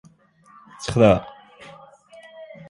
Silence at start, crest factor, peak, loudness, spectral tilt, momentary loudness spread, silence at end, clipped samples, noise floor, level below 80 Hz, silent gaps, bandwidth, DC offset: 0.8 s; 22 dB; -2 dBFS; -19 LUFS; -6.5 dB/octave; 27 LU; 0.25 s; under 0.1%; -54 dBFS; -48 dBFS; none; 11.5 kHz; under 0.1%